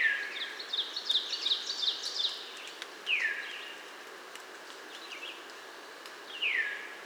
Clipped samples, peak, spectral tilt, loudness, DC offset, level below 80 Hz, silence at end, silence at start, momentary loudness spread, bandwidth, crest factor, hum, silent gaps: under 0.1%; -18 dBFS; 2 dB/octave; -32 LUFS; under 0.1%; under -90 dBFS; 0 s; 0 s; 16 LU; over 20 kHz; 18 dB; none; none